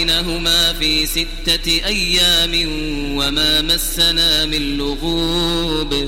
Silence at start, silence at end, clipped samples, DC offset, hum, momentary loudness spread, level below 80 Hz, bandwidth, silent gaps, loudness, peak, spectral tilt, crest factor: 0 s; 0 s; under 0.1%; under 0.1%; none; 7 LU; -26 dBFS; 16.5 kHz; none; -15 LUFS; -2 dBFS; -2.5 dB/octave; 14 dB